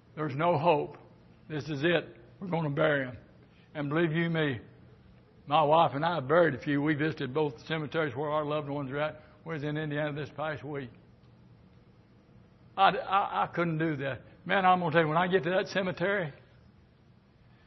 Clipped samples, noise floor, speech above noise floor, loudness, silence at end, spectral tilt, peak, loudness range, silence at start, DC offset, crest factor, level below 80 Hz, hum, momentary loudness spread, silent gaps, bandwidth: under 0.1%; -60 dBFS; 32 dB; -29 LUFS; 1.3 s; -7.5 dB/octave; -8 dBFS; 7 LU; 0.15 s; under 0.1%; 22 dB; -64 dBFS; none; 15 LU; none; 6.2 kHz